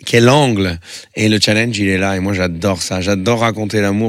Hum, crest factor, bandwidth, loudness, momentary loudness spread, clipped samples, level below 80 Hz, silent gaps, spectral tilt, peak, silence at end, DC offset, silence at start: none; 14 dB; 16 kHz; -14 LUFS; 7 LU; under 0.1%; -50 dBFS; none; -5 dB/octave; 0 dBFS; 0 s; under 0.1%; 0 s